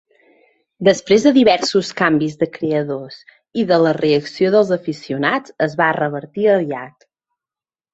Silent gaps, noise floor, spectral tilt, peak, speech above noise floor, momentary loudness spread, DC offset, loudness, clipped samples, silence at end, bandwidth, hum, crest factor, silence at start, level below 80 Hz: none; under -90 dBFS; -5.5 dB/octave; -2 dBFS; over 74 dB; 12 LU; under 0.1%; -17 LUFS; under 0.1%; 1.05 s; 8 kHz; none; 16 dB; 0.8 s; -58 dBFS